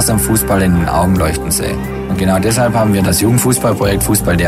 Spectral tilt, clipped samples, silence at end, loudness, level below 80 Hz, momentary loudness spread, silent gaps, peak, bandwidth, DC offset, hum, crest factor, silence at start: -5 dB/octave; under 0.1%; 0 s; -13 LUFS; -26 dBFS; 4 LU; none; 0 dBFS; 16 kHz; under 0.1%; none; 12 dB; 0 s